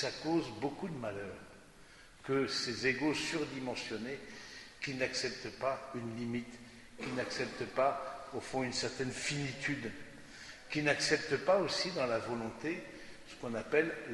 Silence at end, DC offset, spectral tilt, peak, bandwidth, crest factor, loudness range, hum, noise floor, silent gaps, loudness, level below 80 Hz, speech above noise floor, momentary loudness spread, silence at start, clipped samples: 0 s; under 0.1%; -4 dB/octave; -14 dBFS; 11.5 kHz; 22 dB; 5 LU; none; -57 dBFS; none; -36 LUFS; -66 dBFS; 21 dB; 18 LU; 0 s; under 0.1%